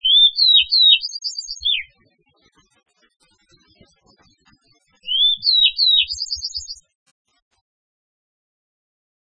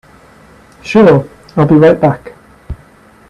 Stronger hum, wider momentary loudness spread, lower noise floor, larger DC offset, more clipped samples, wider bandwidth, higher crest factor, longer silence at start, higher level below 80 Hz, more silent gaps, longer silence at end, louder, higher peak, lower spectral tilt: neither; second, 17 LU vs 23 LU; first, -61 dBFS vs -42 dBFS; neither; neither; second, 9.4 kHz vs 10.5 kHz; first, 20 dB vs 12 dB; second, 0.05 s vs 0.85 s; second, -56 dBFS vs -40 dBFS; neither; first, 2.5 s vs 0.55 s; second, -14 LUFS vs -9 LUFS; about the same, 0 dBFS vs 0 dBFS; second, 3 dB/octave vs -8.5 dB/octave